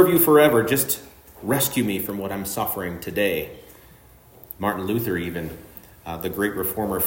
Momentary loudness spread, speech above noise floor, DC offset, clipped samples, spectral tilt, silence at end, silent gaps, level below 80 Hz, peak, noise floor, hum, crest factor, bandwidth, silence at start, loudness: 20 LU; 28 dB; under 0.1%; under 0.1%; -4.5 dB/octave; 0 s; none; -52 dBFS; -2 dBFS; -50 dBFS; none; 20 dB; 16.5 kHz; 0 s; -22 LUFS